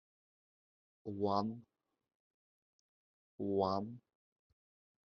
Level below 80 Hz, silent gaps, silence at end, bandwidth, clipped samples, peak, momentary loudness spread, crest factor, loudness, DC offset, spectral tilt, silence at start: -82 dBFS; 2.15-3.39 s; 1.05 s; 6.6 kHz; under 0.1%; -20 dBFS; 17 LU; 24 dB; -38 LUFS; under 0.1%; -7.5 dB/octave; 1.05 s